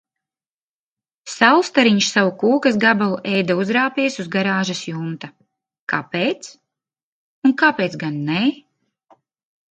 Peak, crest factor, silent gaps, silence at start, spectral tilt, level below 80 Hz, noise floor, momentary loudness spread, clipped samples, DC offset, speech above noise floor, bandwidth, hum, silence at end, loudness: 0 dBFS; 20 dB; 5.81-5.87 s, 7.03-7.42 s; 1.25 s; -4.5 dB/octave; -68 dBFS; under -90 dBFS; 15 LU; under 0.1%; under 0.1%; over 72 dB; 9.2 kHz; none; 1.15 s; -18 LUFS